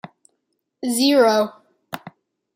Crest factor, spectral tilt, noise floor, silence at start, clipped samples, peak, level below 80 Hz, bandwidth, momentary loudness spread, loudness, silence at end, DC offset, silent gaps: 18 dB; -3 dB/octave; -74 dBFS; 0.85 s; under 0.1%; -4 dBFS; -74 dBFS; 16 kHz; 21 LU; -18 LUFS; 0.45 s; under 0.1%; none